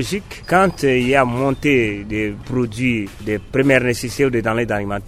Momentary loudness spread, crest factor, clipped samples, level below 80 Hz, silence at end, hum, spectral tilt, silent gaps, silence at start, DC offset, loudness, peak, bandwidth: 8 LU; 18 dB; under 0.1%; -38 dBFS; 0 s; none; -6 dB/octave; none; 0 s; under 0.1%; -18 LUFS; 0 dBFS; 15 kHz